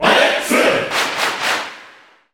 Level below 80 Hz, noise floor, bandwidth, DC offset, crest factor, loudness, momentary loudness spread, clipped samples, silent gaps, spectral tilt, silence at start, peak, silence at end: -54 dBFS; -45 dBFS; 19.5 kHz; under 0.1%; 16 dB; -16 LUFS; 7 LU; under 0.1%; none; -2 dB/octave; 0 s; -2 dBFS; 0.45 s